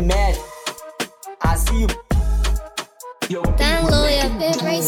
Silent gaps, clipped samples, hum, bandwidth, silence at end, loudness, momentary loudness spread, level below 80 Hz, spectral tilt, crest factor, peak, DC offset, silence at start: none; under 0.1%; none; 18 kHz; 0 s; -21 LUFS; 13 LU; -22 dBFS; -4.5 dB/octave; 16 dB; -4 dBFS; under 0.1%; 0 s